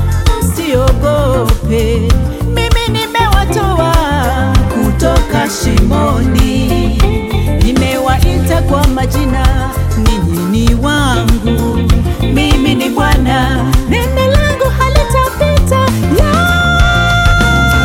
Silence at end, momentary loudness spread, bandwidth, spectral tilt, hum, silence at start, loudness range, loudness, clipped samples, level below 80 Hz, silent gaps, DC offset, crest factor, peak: 0 s; 4 LU; 17 kHz; -5.5 dB/octave; none; 0 s; 2 LU; -11 LUFS; under 0.1%; -14 dBFS; none; under 0.1%; 10 dB; 0 dBFS